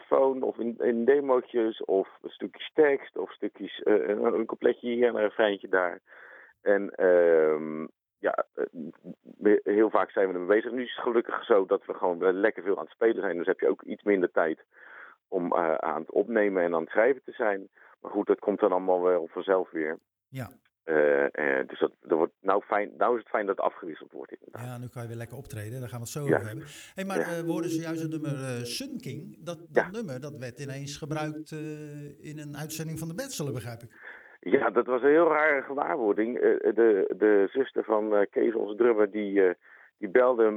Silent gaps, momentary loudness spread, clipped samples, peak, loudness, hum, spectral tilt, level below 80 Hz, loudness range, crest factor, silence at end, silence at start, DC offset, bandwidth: none; 17 LU; under 0.1%; -6 dBFS; -27 LUFS; none; -6 dB/octave; -72 dBFS; 9 LU; 22 dB; 0 s; 0.1 s; under 0.1%; 15.5 kHz